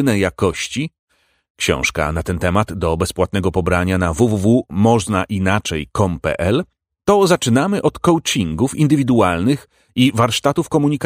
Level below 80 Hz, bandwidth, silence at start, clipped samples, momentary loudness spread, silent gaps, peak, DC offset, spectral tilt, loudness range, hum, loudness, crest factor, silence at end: -38 dBFS; 16 kHz; 0 s; under 0.1%; 7 LU; 0.99-1.07 s, 1.50-1.55 s; 0 dBFS; under 0.1%; -5.5 dB/octave; 3 LU; none; -17 LUFS; 16 dB; 0 s